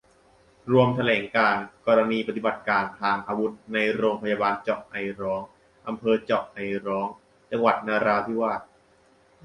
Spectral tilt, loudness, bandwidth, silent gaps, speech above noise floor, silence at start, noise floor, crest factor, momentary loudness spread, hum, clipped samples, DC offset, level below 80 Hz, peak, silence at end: -7 dB/octave; -25 LUFS; 11 kHz; none; 35 dB; 0.65 s; -60 dBFS; 18 dB; 11 LU; none; under 0.1%; under 0.1%; -62 dBFS; -6 dBFS; 0.8 s